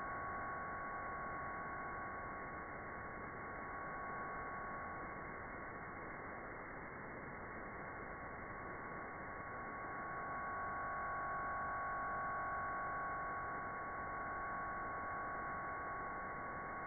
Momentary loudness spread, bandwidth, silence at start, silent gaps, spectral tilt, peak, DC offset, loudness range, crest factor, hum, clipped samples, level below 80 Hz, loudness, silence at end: 7 LU; 2.4 kHz; 0 s; none; 0 dB/octave; -34 dBFS; under 0.1%; 6 LU; 12 dB; none; under 0.1%; -64 dBFS; -45 LUFS; 0 s